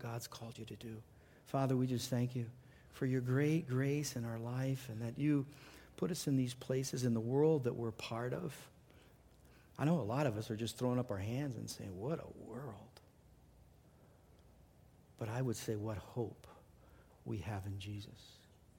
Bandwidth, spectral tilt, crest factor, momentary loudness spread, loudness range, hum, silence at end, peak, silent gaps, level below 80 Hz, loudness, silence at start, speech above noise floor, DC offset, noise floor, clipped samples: 16.5 kHz; -6.5 dB/octave; 18 dB; 15 LU; 9 LU; none; 0.4 s; -22 dBFS; none; -68 dBFS; -39 LUFS; 0 s; 26 dB; under 0.1%; -65 dBFS; under 0.1%